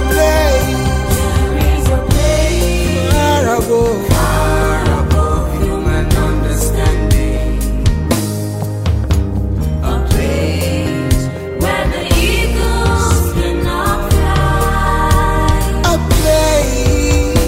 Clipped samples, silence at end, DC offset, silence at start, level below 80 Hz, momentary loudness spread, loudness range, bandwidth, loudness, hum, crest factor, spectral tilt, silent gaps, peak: under 0.1%; 0 s; under 0.1%; 0 s; -16 dBFS; 5 LU; 3 LU; 16.5 kHz; -14 LUFS; none; 12 dB; -5.5 dB/octave; none; 0 dBFS